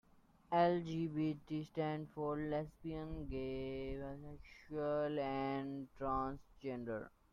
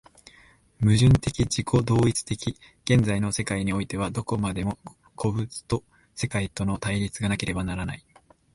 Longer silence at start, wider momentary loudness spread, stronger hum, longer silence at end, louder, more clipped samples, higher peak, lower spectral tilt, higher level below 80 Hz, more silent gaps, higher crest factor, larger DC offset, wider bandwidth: second, 0.5 s vs 0.8 s; about the same, 11 LU vs 12 LU; neither; second, 0.25 s vs 0.55 s; second, -41 LUFS vs -26 LUFS; neither; second, -22 dBFS vs -8 dBFS; first, -8.5 dB/octave vs -5.5 dB/octave; second, -60 dBFS vs -42 dBFS; neither; about the same, 20 dB vs 18 dB; neither; second, 7.2 kHz vs 11.5 kHz